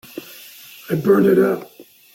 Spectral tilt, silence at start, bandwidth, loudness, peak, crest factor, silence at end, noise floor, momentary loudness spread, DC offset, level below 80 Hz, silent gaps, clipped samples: -7 dB/octave; 0.15 s; 17 kHz; -17 LUFS; -4 dBFS; 16 dB; 0.35 s; -41 dBFS; 24 LU; under 0.1%; -60 dBFS; none; under 0.1%